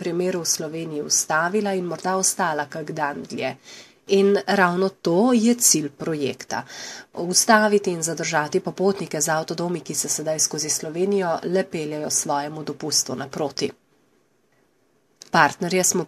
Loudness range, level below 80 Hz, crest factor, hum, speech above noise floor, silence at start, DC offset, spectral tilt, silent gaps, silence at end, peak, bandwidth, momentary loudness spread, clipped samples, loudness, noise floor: 5 LU; -68 dBFS; 22 dB; none; 42 dB; 0 s; under 0.1%; -3 dB/octave; none; 0 s; 0 dBFS; 14 kHz; 12 LU; under 0.1%; -22 LUFS; -64 dBFS